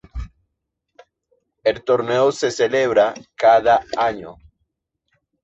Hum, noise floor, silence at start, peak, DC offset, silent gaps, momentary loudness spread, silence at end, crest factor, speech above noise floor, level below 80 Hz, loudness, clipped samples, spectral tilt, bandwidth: none; -77 dBFS; 0.15 s; -2 dBFS; under 0.1%; none; 20 LU; 1.1 s; 18 dB; 60 dB; -44 dBFS; -18 LUFS; under 0.1%; -4.5 dB/octave; 8.2 kHz